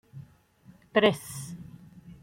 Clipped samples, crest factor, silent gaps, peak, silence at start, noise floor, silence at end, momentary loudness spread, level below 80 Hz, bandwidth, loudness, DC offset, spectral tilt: under 0.1%; 26 dB; none; -6 dBFS; 0.15 s; -57 dBFS; 0.1 s; 26 LU; -64 dBFS; 16.5 kHz; -27 LUFS; under 0.1%; -4.5 dB/octave